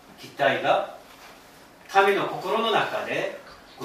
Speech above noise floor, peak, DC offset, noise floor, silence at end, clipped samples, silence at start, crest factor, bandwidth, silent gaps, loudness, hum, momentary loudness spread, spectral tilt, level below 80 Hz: 26 dB; -6 dBFS; under 0.1%; -50 dBFS; 0 s; under 0.1%; 0.1 s; 20 dB; 15.5 kHz; none; -24 LUFS; none; 18 LU; -4 dB/octave; -66 dBFS